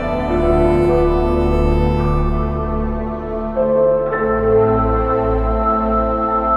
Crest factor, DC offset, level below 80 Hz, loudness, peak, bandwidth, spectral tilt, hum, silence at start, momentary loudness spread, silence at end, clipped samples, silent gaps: 12 dB; under 0.1%; -22 dBFS; -17 LUFS; -2 dBFS; 8.8 kHz; -9.5 dB/octave; none; 0 s; 7 LU; 0 s; under 0.1%; none